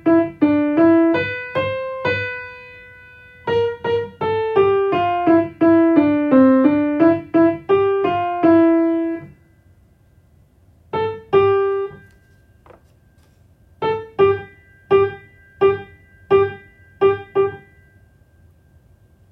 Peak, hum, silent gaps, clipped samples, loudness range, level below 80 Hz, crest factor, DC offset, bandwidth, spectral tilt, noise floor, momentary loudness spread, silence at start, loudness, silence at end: -2 dBFS; none; none; under 0.1%; 8 LU; -56 dBFS; 16 dB; under 0.1%; 4.9 kHz; -9 dB/octave; -53 dBFS; 11 LU; 0.05 s; -17 LUFS; 1.75 s